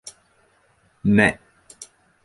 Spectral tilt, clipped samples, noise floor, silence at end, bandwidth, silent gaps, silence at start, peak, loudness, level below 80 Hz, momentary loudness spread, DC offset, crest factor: -6 dB/octave; under 0.1%; -61 dBFS; 0.4 s; 11.5 kHz; none; 0.05 s; -2 dBFS; -19 LUFS; -50 dBFS; 25 LU; under 0.1%; 22 dB